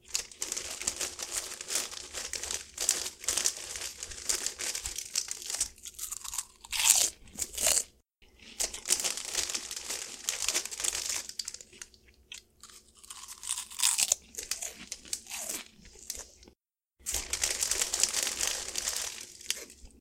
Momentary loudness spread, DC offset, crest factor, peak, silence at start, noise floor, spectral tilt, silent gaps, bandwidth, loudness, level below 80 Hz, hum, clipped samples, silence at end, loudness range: 16 LU; under 0.1%; 34 dB; -2 dBFS; 0.1 s; -72 dBFS; 1.5 dB/octave; none; 17 kHz; -31 LUFS; -58 dBFS; none; under 0.1%; 0 s; 6 LU